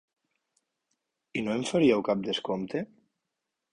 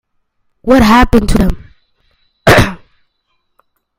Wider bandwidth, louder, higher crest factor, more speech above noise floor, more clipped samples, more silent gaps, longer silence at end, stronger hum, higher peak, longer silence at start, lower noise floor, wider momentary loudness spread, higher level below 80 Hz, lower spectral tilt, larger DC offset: second, 11 kHz vs 17 kHz; second, -28 LUFS vs -10 LUFS; first, 20 dB vs 12 dB; about the same, 58 dB vs 56 dB; second, under 0.1% vs 0.6%; neither; second, 0.9 s vs 1.25 s; neither; second, -12 dBFS vs 0 dBFS; first, 1.35 s vs 0.65 s; first, -85 dBFS vs -64 dBFS; about the same, 12 LU vs 11 LU; second, -66 dBFS vs -22 dBFS; about the same, -5.5 dB/octave vs -5.5 dB/octave; neither